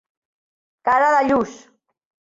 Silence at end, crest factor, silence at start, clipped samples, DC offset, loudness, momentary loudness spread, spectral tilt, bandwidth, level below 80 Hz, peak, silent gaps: 0.7 s; 16 dB; 0.85 s; under 0.1%; under 0.1%; -18 LUFS; 11 LU; -5 dB/octave; 7.8 kHz; -58 dBFS; -6 dBFS; none